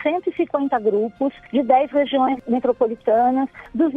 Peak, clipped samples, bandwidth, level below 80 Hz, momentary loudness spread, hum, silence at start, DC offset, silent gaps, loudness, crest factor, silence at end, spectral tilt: -4 dBFS; under 0.1%; 4.5 kHz; -58 dBFS; 6 LU; none; 0 s; under 0.1%; none; -20 LUFS; 16 dB; 0 s; -7.5 dB/octave